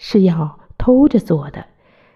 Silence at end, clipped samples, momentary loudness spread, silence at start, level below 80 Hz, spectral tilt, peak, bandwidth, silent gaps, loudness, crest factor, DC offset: 0.55 s; under 0.1%; 17 LU; 0 s; -36 dBFS; -9 dB/octave; -2 dBFS; 12 kHz; none; -15 LUFS; 14 dB; under 0.1%